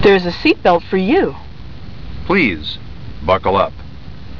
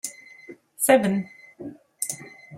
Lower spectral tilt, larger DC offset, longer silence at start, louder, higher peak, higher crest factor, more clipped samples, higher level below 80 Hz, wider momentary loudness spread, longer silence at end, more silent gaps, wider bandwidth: first, -7.5 dB/octave vs -4 dB/octave; first, 3% vs under 0.1%; about the same, 0 s vs 0.05 s; first, -15 LUFS vs -23 LUFS; about the same, -2 dBFS vs -4 dBFS; second, 14 dB vs 22 dB; neither; first, -36 dBFS vs -70 dBFS; second, 22 LU vs 26 LU; about the same, 0 s vs 0 s; neither; second, 5.4 kHz vs 16 kHz